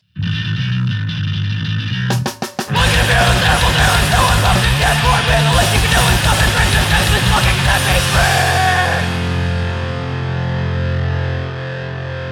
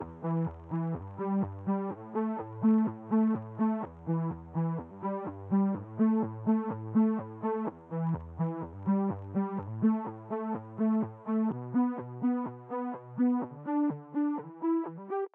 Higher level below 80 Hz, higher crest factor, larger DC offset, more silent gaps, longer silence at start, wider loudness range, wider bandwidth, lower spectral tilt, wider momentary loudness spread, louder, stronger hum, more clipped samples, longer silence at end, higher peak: first, -22 dBFS vs -62 dBFS; about the same, 14 dB vs 14 dB; neither; neither; first, 0.15 s vs 0 s; first, 5 LU vs 2 LU; first, 18.5 kHz vs 3.1 kHz; second, -4 dB/octave vs -12.5 dB/octave; about the same, 9 LU vs 8 LU; first, -15 LUFS vs -32 LUFS; neither; neither; about the same, 0 s vs 0.1 s; first, 0 dBFS vs -16 dBFS